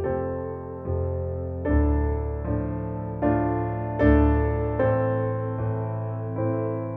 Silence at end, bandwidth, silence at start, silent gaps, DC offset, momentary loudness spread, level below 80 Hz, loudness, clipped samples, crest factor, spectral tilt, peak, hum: 0 s; 3.5 kHz; 0 s; none; under 0.1%; 10 LU; -32 dBFS; -26 LUFS; under 0.1%; 18 dB; -12 dB/octave; -6 dBFS; none